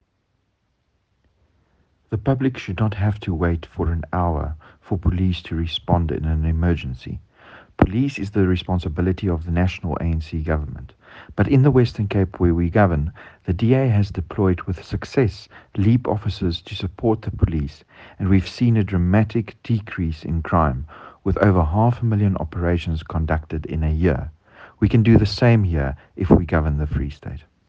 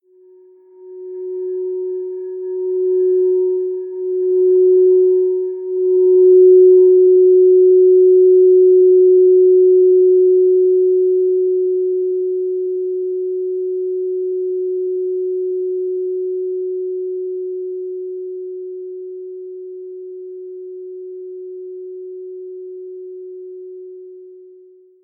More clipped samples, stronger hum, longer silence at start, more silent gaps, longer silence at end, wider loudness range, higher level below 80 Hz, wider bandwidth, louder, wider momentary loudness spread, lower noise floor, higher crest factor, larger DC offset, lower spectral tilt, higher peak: neither; neither; first, 2.1 s vs 0.8 s; neither; second, 0.3 s vs 0.7 s; second, 4 LU vs 21 LU; first, -34 dBFS vs -84 dBFS; first, 7.4 kHz vs 1 kHz; second, -21 LUFS vs -14 LUFS; second, 12 LU vs 22 LU; first, -69 dBFS vs -47 dBFS; first, 20 dB vs 12 dB; neither; second, -8.5 dB/octave vs -14 dB/octave; first, 0 dBFS vs -4 dBFS